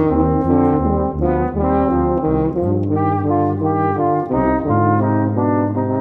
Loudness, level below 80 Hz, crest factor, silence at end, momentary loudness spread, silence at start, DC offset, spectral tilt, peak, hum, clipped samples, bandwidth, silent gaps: -17 LUFS; -32 dBFS; 16 dB; 0 s; 3 LU; 0 s; under 0.1%; -12 dB/octave; 0 dBFS; none; under 0.1%; 4 kHz; none